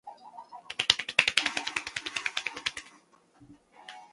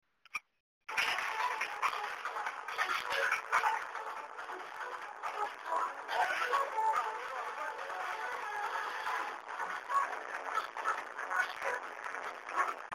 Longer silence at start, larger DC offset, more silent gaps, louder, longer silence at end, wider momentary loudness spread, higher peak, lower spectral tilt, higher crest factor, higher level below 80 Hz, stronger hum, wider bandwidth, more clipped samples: second, 0.05 s vs 0.35 s; neither; second, none vs 0.60-0.81 s; first, -28 LUFS vs -36 LUFS; about the same, 0.05 s vs 0 s; first, 24 LU vs 10 LU; first, 0 dBFS vs -16 dBFS; about the same, 0.5 dB/octave vs 0 dB/octave; first, 34 dB vs 20 dB; first, -68 dBFS vs -80 dBFS; neither; second, 11.5 kHz vs 16 kHz; neither